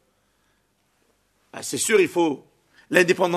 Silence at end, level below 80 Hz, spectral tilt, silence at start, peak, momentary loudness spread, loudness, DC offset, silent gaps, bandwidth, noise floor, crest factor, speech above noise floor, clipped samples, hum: 0 s; -72 dBFS; -3.5 dB/octave; 1.55 s; -2 dBFS; 16 LU; -21 LUFS; under 0.1%; none; 13.5 kHz; -68 dBFS; 22 dB; 47 dB; under 0.1%; 50 Hz at -60 dBFS